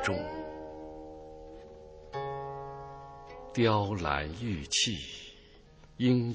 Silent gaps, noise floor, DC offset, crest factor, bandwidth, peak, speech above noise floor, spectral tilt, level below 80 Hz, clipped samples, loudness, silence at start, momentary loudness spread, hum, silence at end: none; -56 dBFS; under 0.1%; 22 dB; 8 kHz; -12 dBFS; 26 dB; -4.5 dB/octave; -52 dBFS; under 0.1%; -32 LUFS; 0 s; 21 LU; none; 0 s